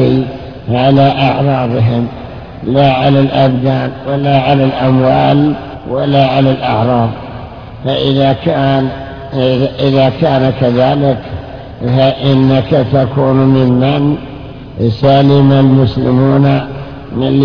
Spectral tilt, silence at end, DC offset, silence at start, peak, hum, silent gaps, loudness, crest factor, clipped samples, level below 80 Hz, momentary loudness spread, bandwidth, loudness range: -9.5 dB/octave; 0 s; under 0.1%; 0 s; 0 dBFS; none; none; -11 LUFS; 10 dB; 0.4%; -36 dBFS; 14 LU; 5.4 kHz; 3 LU